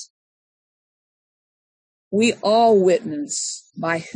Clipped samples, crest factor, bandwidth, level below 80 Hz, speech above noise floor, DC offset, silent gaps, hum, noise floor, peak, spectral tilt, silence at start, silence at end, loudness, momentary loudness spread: under 0.1%; 16 dB; 10.5 kHz; -70 dBFS; over 71 dB; under 0.1%; 0.10-2.11 s; none; under -90 dBFS; -6 dBFS; -4 dB/octave; 0 s; 0.05 s; -19 LUFS; 11 LU